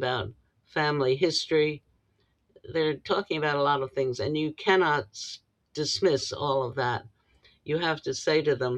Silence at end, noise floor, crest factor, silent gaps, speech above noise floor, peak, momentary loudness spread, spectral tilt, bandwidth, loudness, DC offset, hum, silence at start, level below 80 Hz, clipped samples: 0 s; -70 dBFS; 20 dB; none; 44 dB; -8 dBFS; 12 LU; -4.5 dB/octave; 9.8 kHz; -27 LUFS; under 0.1%; none; 0 s; -64 dBFS; under 0.1%